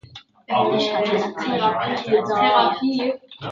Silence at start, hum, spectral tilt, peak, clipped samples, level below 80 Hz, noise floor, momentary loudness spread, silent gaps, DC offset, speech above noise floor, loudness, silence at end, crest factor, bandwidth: 0.15 s; none; -5.5 dB/octave; -4 dBFS; under 0.1%; -62 dBFS; -44 dBFS; 7 LU; none; under 0.1%; 25 dB; -20 LUFS; 0 s; 16 dB; 7.6 kHz